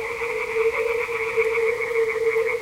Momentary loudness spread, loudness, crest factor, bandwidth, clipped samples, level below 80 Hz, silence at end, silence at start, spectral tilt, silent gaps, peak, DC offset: 3 LU; -23 LUFS; 12 dB; 16 kHz; under 0.1%; -54 dBFS; 0 s; 0 s; -3 dB/octave; none; -10 dBFS; under 0.1%